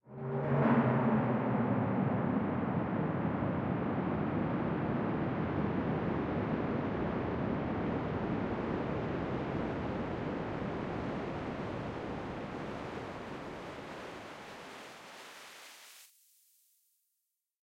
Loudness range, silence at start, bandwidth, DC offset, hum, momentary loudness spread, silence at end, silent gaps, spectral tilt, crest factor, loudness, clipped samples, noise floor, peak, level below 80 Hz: 14 LU; 0.05 s; 15.5 kHz; under 0.1%; none; 16 LU; 1.6 s; none; -8 dB/octave; 18 dB; -35 LUFS; under 0.1%; -85 dBFS; -16 dBFS; -56 dBFS